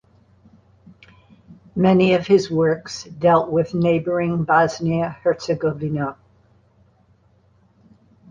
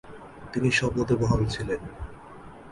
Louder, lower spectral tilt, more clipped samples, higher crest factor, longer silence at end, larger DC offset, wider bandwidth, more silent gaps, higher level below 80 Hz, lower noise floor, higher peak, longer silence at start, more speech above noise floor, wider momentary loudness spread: first, -19 LUFS vs -26 LUFS; about the same, -7 dB/octave vs -6 dB/octave; neither; about the same, 18 dB vs 18 dB; first, 2.15 s vs 0 s; neither; second, 7.6 kHz vs 11.5 kHz; neither; second, -54 dBFS vs -42 dBFS; first, -57 dBFS vs -45 dBFS; first, -2 dBFS vs -10 dBFS; first, 1.5 s vs 0.05 s; first, 39 dB vs 20 dB; second, 9 LU vs 22 LU